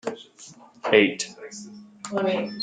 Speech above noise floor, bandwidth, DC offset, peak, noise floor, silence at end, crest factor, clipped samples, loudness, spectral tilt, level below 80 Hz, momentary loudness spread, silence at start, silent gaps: 19 dB; 9.4 kHz; under 0.1%; -2 dBFS; -43 dBFS; 0 s; 24 dB; under 0.1%; -23 LUFS; -3.5 dB/octave; -70 dBFS; 25 LU; 0.05 s; none